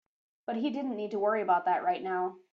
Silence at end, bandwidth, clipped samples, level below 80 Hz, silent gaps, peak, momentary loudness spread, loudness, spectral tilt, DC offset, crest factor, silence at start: 0.15 s; 6.8 kHz; under 0.1%; -80 dBFS; none; -14 dBFS; 7 LU; -31 LUFS; -7 dB/octave; under 0.1%; 16 dB; 0.5 s